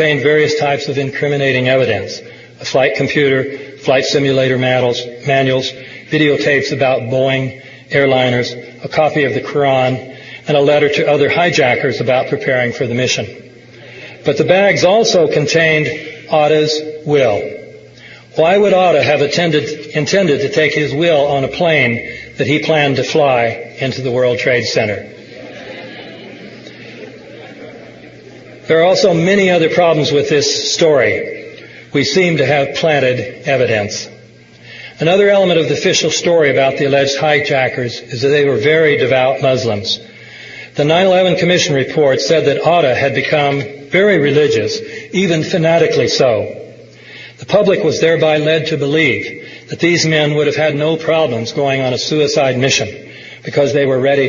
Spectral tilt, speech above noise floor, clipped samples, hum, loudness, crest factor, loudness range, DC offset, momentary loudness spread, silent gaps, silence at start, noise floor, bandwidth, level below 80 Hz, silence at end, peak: -4.5 dB/octave; 28 dB; under 0.1%; none; -13 LUFS; 14 dB; 3 LU; under 0.1%; 18 LU; none; 0 s; -40 dBFS; 7.4 kHz; -54 dBFS; 0 s; 0 dBFS